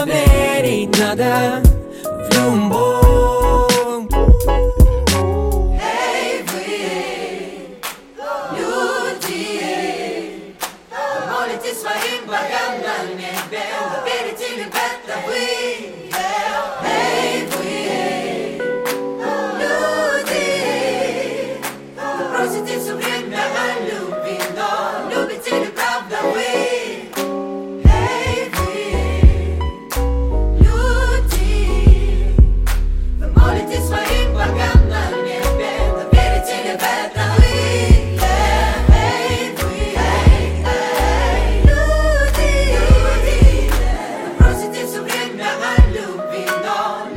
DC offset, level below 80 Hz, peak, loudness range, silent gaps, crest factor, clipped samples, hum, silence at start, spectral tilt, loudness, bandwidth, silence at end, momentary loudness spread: under 0.1%; -18 dBFS; 0 dBFS; 7 LU; none; 16 dB; under 0.1%; none; 0 s; -5 dB/octave; -17 LUFS; 16.5 kHz; 0 s; 10 LU